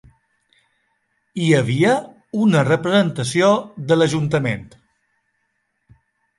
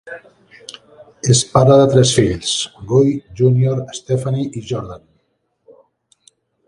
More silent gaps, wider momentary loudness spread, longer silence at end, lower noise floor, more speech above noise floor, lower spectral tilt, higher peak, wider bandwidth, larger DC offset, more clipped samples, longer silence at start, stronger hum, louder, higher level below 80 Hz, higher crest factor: neither; second, 8 LU vs 24 LU; about the same, 1.75 s vs 1.7 s; first, -71 dBFS vs -67 dBFS; about the same, 53 dB vs 51 dB; about the same, -6 dB/octave vs -5.5 dB/octave; second, -4 dBFS vs 0 dBFS; about the same, 11.5 kHz vs 11.5 kHz; neither; neither; first, 1.35 s vs 0.05 s; neither; second, -18 LUFS vs -15 LUFS; second, -56 dBFS vs -44 dBFS; about the same, 16 dB vs 16 dB